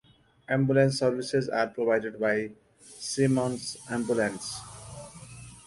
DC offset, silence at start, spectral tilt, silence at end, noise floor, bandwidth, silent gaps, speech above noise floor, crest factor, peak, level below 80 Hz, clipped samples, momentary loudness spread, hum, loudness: under 0.1%; 0.5 s; -5.5 dB/octave; 0.05 s; -46 dBFS; 11.5 kHz; none; 19 dB; 18 dB; -10 dBFS; -62 dBFS; under 0.1%; 19 LU; none; -28 LUFS